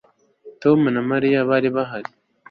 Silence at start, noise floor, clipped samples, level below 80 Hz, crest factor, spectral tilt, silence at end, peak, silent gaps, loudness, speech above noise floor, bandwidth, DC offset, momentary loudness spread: 0.45 s; -46 dBFS; under 0.1%; -62 dBFS; 16 dB; -9 dB/octave; 0.5 s; -4 dBFS; none; -19 LUFS; 28 dB; 6 kHz; under 0.1%; 12 LU